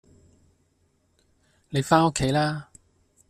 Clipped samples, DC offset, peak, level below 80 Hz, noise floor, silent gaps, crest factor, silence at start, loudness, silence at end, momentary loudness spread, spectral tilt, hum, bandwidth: under 0.1%; under 0.1%; -4 dBFS; -52 dBFS; -68 dBFS; none; 24 dB; 1.7 s; -24 LUFS; 0.65 s; 10 LU; -5.5 dB/octave; none; 14 kHz